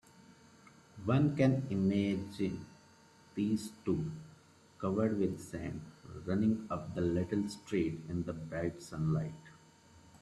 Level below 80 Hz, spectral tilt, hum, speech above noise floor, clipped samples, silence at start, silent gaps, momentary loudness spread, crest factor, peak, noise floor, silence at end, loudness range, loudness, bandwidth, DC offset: -64 dBFS; -7.5 dB/octave; none; 28 dB; under 0.1%; 0.2 s; none; 13 LU; 20 dB; -16 dBFS; -62 dBFS; 0.05 s; 4 LU; -35 LUFS; 12.5 kHz; under 0.1%